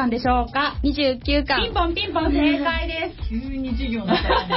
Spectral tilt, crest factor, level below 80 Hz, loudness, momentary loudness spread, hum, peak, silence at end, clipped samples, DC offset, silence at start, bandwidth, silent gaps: -10 dB/octave; 14 dB; -30 dBFS; -22 LUFS; 8 LU; none; -8 dBFS; 0 s; under 0.1%; under 0.1%; 0 s; 5.8 kHz; none